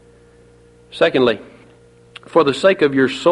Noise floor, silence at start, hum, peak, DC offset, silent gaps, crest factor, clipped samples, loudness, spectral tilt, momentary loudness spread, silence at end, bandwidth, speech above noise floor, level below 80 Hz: -48 dBFS; 0.95 s; 60 Hz at -50 dBFS; 0 dBFS; under 0.1%; none; 16 dB; under 0.1%; -16 LUFS; -5.5 dB/octave; 7 LU; 0 s; 11.5 kHz; 33 dB; -56 dBFS